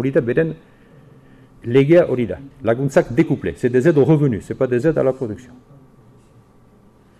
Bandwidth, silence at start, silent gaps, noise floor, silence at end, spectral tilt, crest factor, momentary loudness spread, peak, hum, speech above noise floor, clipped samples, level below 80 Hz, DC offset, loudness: 11.5 kHz; 0 s; none; -50 dBFS; 1.8 s; -8.5 dB/octave; 14 dB; 12 LU; -4 dBFS; none; 33 dB; under 0.1%; -48 dBFS; under 0.1%; -17 LUFS